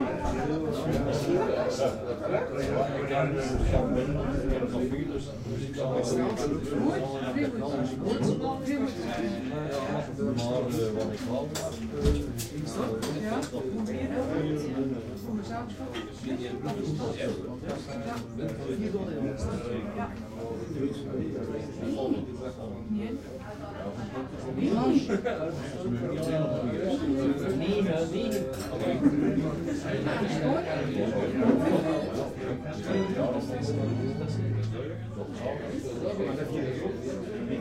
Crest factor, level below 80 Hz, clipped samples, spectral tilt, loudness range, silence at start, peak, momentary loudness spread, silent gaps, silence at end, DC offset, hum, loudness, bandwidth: 20 dB; -44 dBFS; under 0.1%; -6.5 dB/octave; 5 LU; 0 s; -10 dBFS; 9 LU; none; 0 s; under 0.1%; none; -31 LUFS; 16 kHz